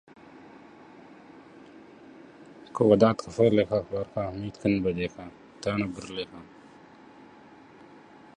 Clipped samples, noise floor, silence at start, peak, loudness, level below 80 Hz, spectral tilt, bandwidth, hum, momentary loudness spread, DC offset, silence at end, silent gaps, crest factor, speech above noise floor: under 0.1%; -52 dBFS; 0.35 s; -6 dBFS; -26 LUFS; -56 dBFS; -7 dB/octave; 10.5 kHz; none; 28 LU; under 0.1%; 1.95 s; none; 24 dB; 26 dB